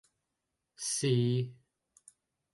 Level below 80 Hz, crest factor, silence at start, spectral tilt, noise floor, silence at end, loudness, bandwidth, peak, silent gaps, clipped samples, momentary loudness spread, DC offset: -74 dBFS; 18 dB; 0.8 s; -5 dB/octave; -86 dBFS; 1 s; -32 LUFS; 11.5 kHz; -16 dBFS; none; under 0.1%; 11 LU; under 0.1%